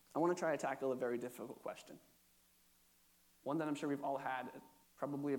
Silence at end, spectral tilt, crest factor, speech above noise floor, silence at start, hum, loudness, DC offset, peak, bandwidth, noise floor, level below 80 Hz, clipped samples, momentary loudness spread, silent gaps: 0 s; -6 dB/octave; 20 dB; 31 dB; 0.15 s; none; -42 LUFS; under 0.1%; -24 dBFS; 19 kHz; -72 dBFS; -86 dBFS; under 0.1%; 15 LU; none